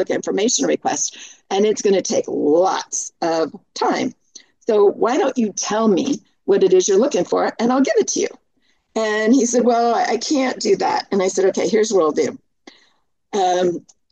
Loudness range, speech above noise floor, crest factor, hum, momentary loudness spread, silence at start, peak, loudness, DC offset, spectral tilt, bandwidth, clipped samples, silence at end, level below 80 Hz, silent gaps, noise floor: 2 LU; 47 dB; 14 dB; none; 8 LU; 0 s; -4 dBFS; -18 LUFS; under 0.1%; -3.5 dB/octave; 9 kHz; under 0.1%; 0.35 s; -68 dBFS; none; -65 dBFS